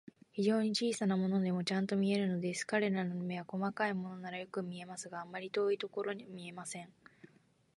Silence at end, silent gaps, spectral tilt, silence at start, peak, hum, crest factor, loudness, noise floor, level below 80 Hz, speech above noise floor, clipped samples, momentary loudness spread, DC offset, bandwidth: 0.5 s; none; -5.5 dB/octave; 0.35 s; -20 dBFS; none; 16 dB; -36 LUFS; -69 dBFS; -80 dBFS; 33 dB; under 0.1%; 12 LU; under 0.1%; 11.5 kHz